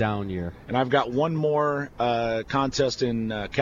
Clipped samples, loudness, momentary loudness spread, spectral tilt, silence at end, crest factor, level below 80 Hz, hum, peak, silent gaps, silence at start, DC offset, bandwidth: under 0.1%; -25 LUFS; 6 LU; -6 dB/octave; 0 s; 18 dB; -48 dBFS; none; -8 dBFS; none; 0 s; under 0.1%; 7.4 kHz